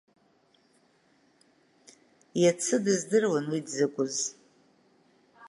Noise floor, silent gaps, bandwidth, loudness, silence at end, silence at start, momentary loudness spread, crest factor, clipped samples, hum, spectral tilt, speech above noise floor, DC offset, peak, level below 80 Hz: -66 dBFS; none; 11.5 kHz; -28 LUFS; 0 s; 2.35 s; 8 LU; 18 dB; under 0.1%; none; -4 dB/octave; 39 dB; under 0.1%; -12 dBFS; -82 dBFS